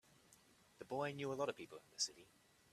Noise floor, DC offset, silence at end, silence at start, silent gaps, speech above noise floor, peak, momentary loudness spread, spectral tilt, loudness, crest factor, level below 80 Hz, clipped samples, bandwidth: -70 dBFS; under 0.1%; 0.5 s; 0.3 s; none; 25 dB; -26 dBFS; 14 LU; -3 dB/octave; -45 LUFS; 22 dB; -84 dBFS; under 0.1%; 14.5 kHz